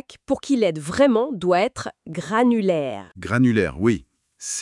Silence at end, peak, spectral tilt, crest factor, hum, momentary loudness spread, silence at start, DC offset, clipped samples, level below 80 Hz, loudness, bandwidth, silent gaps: 0 s; -4 dBFS; -5.5 dB/octave; 18 dB; none; 13 LU; 0.1 s; under 0.1%; under 0.1%; -52 dBFS; -21 LUFS; 12 kHz; none